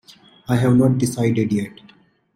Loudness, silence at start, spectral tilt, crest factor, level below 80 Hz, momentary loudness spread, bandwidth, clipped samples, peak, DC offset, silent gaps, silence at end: -19 LUFS; 0.5 s; -7 dB/octave; 16 dB; -52 dBFS; 13 LU; 15.5 kHz; under 0.1%; -4 dBFS; under 0.1%; none; 0.65 s